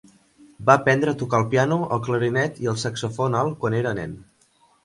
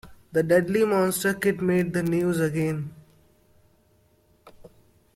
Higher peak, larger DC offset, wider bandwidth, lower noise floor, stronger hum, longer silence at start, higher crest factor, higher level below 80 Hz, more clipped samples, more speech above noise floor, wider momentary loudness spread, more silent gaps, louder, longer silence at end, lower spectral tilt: first, 0 dBFS vs -8 dBFS; neither; second, 11.5 kHz vs 16.5 kHz; about the same, -60 dBFS vs -62 dBFS; neither; first, 0.6 s vs 0.05 s; about the same, 22 dB vs 18 dB; about the same, -56 dBFS vs -58 dBFS; neither; about the same, 39 dB vs 39 dB; about the same, 9 LU vs 7 LU; neither; about the same, -22 LUFS vs -24 LUFS; about the same, 0.6 s vs 0.5 s; about the same, -6 dB/octave vs -6 dB/octave